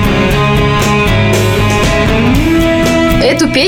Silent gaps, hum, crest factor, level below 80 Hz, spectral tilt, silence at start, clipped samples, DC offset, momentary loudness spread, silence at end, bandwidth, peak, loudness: none; none; 8 dB; -20 dBFS; -5.5 dB/octave; 0 s; under 0.1%; under 0.1%; 1 LU; 0 s; 17.5 kHz; 0 dBFS; -10 LUFS